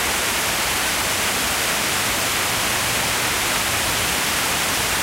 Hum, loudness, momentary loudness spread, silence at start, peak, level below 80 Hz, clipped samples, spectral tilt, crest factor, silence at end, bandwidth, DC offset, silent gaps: none; -19 LUFS; 0 LU; 0 s; -6 dBFS; -42 dBFS; under 0.1%; -1 dB/octave; 14 dB; 0 s; 16 kHz; under 0.1%; none